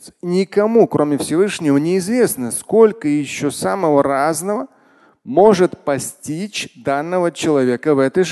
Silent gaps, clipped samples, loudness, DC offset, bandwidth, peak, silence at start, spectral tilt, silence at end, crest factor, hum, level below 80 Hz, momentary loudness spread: none; under 0.1%; -17 LUFS; under 0.1%; 12.5 kHz; 0 dBFS; 0.05 s; -5.5 dB/octave; 0 s; 16 dB; none; -58 dBFS; 10 LU